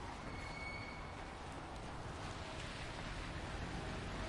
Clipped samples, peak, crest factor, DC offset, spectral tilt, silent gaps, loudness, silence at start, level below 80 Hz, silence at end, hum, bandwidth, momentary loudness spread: under 0.1%; -32 dBFS; 14 dB; under 0.1%; -5 dB/octave; none; -47 LUFS; 0 s; -52 dBFS; 0 s; none; 11.5 kHz; 4 LU